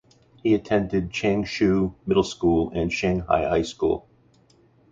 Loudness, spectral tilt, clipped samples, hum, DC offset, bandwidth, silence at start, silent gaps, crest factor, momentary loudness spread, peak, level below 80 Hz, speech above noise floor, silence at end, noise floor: -23 LUFS; -6.5 dB/octave; under 0.1%; none; under 0.1%; 7.8 kHz; 0.45 s; none; 18 dB; 4 LU; -6 dBFS; -44 dBFS; 36 dB; 0.9 s; -58 dBFS